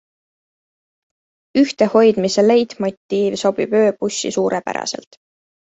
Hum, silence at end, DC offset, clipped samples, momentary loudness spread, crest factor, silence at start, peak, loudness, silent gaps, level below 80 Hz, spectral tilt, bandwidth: none; 0.7 s; under 0.1%; under 0.1%; 10 LU; 16 dB; 1.55 s; -2 dBFS; -17 LUFS; 2.97-3.09 s; -60 dBFS; -4.5 dB/octave; 8.2 kHz